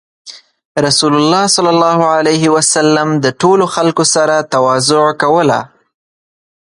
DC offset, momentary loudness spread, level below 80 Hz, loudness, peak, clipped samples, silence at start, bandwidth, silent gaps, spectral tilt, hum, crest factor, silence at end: under 0.1%; 3 LU; -56 dBFS; -11 LUFS; 0 dBFS; under 0.1%; 0.25 s; 11.5 kHz; 0.65-0.75 s; -3.5 dB/octave; none; 12 dB; 1 s